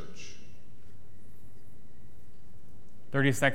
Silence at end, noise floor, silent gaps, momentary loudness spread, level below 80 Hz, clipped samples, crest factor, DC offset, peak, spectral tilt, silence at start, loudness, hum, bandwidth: 0 s; -56 dBFS; none; 29 LU; -62 dBFS; under 0.1%; 26 dB; 3%; -10 dBFS; -5 dB/octave; 0 s; -29 LUFS; none; 16.5 kHz